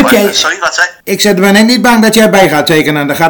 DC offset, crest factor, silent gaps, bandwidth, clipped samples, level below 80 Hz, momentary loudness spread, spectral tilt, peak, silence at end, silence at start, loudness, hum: under 0.1%; 8 dB; none; over 20 kHz; 5%; -42 dBFS; 5 LU; -4 dB/octave; 0 dBFS; 0 s; 0 s; -7 LUFS; none